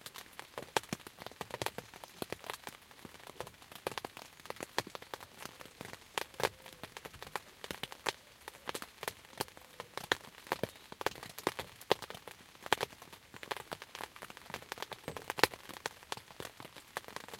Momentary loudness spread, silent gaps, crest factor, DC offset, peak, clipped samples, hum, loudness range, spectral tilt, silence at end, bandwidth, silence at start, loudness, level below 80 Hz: 14 LU; none; 42 dB; under 0.1%; -2 dBFS; under 0.1%; none; 6 LU; -2.5 dB/octave; 0 s; 17 kHz; 0 s; -41 LUFS; -70 dBFS